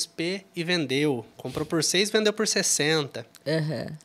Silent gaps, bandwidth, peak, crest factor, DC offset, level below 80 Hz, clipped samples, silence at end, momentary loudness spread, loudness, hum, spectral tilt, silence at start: none; 15.5 kHz; -8 dBFS; 18 dB; under 0.1%; -64 dBFS; under 0.1%; 0.05 s; 11 LU; -25 LUFS; none; -3 dB/octave; 0 s